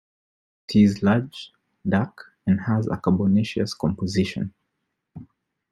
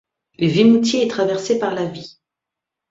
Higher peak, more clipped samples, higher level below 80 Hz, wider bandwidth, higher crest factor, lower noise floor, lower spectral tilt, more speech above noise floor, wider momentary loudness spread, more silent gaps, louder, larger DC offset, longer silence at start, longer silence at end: second, -6 dBFS vs -2 dBFS; neither; about the same, -56 dBFS vs -60 dBFS; first, 11.5 kHz vs 7.8 kHz; about the same, 18 dB vs 16 dB; second, -78 dBFS vs -84 dBFS; first, -7 dB/octave vs -5.5 dB/octave; second, 57 dB vs 67 dB; first, 15 LU vs 12 LU; neither; second, -23 LUFS vs -17 LUFS; neither; first, 0.7 s vs 0.4 s; second, 0.5 s vs 0.8 s